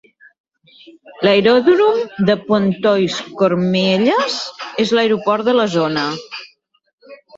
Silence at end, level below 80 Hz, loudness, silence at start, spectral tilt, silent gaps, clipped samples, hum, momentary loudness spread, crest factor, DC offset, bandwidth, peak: 0.25 s; -58 dBFS; -15 LUFS; 1.05 s; -5.5 dB/octave; 6.93-6.98 s; under 0.1%; none; 10 LU; 16 dB; under 0.1%; 8 kHz; -2 dBFS